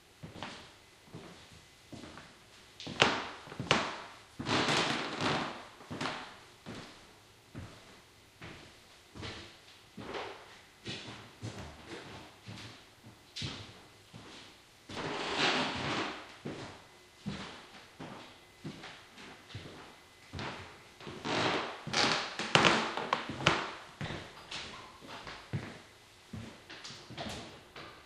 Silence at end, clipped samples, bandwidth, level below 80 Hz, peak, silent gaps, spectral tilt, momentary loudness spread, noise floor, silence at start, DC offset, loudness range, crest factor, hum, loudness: 0 s; under 0.1%; 15.5 kHz; -64 dBFS; -2 dBFS; none; -3.5 dB/octave; 24 LU; -59 dBFS; 0.05 s; under 0.1%; 16 LU; 38 dB; none; -35 LUFS